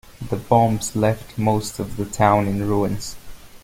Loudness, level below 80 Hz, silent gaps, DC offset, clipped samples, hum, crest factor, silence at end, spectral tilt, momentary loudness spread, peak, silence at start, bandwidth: -21 LUFS; -42 dBFS; none; under 0.1%; under 0.1%; none; 18 dB; 0.05 s; -6 dB/octave; 12 LU; -2 dBFS; 0.1 s; 16.5 kHz